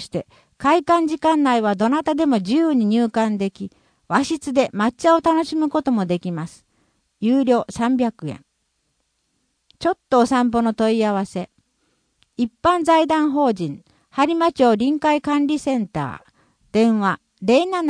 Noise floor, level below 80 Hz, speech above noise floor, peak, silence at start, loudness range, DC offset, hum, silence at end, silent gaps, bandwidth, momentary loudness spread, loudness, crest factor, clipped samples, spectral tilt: -70 dBFS; -56 dBFS; 52 dB; -4 dBFS; 0 s; 4 LU; under 0.1%; none; 0 s; none; 10.5 kHz; 13 LU; -19 LUFS; 16 dB; under 0.1%; -6 dB/octave